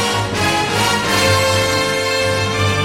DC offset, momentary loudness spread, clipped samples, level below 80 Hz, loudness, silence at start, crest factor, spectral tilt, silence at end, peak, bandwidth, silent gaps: under 0.1%; 3 LU; under 0.1%; -42 dBFS; -15 LUFS; 0 s; 14 dB; -3.5 dB/octave; 0 s; -2 dBFS; 16.5 kHz; none